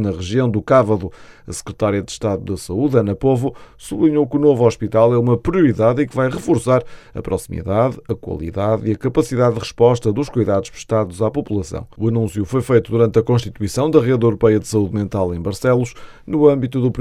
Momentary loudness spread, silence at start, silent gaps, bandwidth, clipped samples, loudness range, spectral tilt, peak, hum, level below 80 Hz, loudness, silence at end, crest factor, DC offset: 10 LU; 0 s; none; 13.5 kHz; under 0.1%; 3 LU; -7.5 dB/octave; 0 dBFS; none; -42 dBFS; -17 LUFS; 0 s; 16 dB; under 0.1%